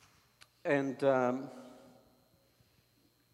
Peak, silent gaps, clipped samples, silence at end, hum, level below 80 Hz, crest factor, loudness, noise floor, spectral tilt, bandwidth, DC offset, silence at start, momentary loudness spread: -16 dBFS; none; under 0.1%; 1.6 s; none; -82 dBFS; 20 dB; -33 LUFS; -71 dBFS; -7 dB/octave; 13.5 kHz; under 0.1%; 0.65 s; 22 LU